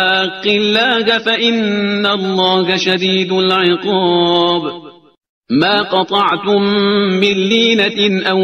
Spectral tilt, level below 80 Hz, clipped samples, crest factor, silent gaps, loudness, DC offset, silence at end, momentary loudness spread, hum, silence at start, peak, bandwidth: -5 dB/octave; -56 dBFS; under 0.1%; 14 dB; 5.29-5.42 s; -13 LUFS; under 0.1%; 0 s; 3 LU; none; 0 s; 0 dBFS; 8.4 kHz